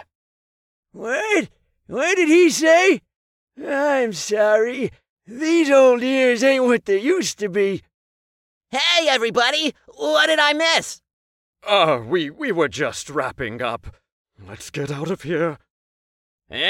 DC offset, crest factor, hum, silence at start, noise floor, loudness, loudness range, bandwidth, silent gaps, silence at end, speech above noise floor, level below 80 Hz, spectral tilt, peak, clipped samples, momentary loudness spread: under 0.1%; 16 dB; none; 0.95 s; under -90 dBFS; -19 LUFS; 8 LU; 16 kHz; 3.16-3.47 s, 5.09-5.17 s, 7.94-8.61 s, 11.13-11.53 s, 14.12-14.25 s, 15.70-16.39 s; 0 s; over 71 dB; -58 dBFS; -3.5 dB/octave; -4 dBFS; under 0.1%; 15 LU